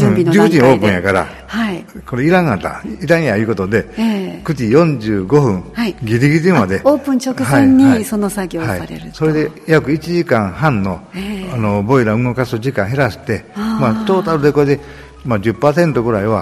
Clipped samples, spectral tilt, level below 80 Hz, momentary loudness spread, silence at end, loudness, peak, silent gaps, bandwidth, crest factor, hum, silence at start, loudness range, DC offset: 0.2%; -7 dB/octave; -40 dBFS; 10 LU; 0 s; -14 LUFS; 0 dBFS; none; 14.5 kHz; 14 dB; none; 0 s; 3 LU; under 0.1%